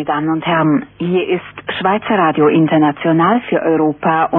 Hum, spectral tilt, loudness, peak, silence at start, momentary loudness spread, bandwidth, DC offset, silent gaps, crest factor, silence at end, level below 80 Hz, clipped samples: none; -11 dB/octave; -14 LUFS; -2 dBFS; 0 s; 6 LU; 3.9 kHz; under 0.1%; none; 12 dB; 0 s; -54 dBFS; under 0.1%